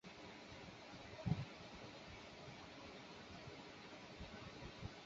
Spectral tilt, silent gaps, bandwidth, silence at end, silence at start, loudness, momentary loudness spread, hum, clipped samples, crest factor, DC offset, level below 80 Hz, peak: -5 dB/octave; none; 7.6 kHz; 0 s; 0.05 s; -53 LUFS; 10 LU; none; under 0.1%; 26 dB; under 0.1%; -66 dBFS; -26 dBFS